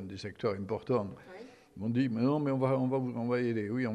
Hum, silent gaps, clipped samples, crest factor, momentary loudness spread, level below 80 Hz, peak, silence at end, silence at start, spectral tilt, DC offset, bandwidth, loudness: none; none; under 0.1%; 16 dB; 16 LU; -70 dBFS; -16 dBFS; 0 s; 0 s; -8.5 dB/octave; under 0.1%; 9.6 kHz; -32 LUFS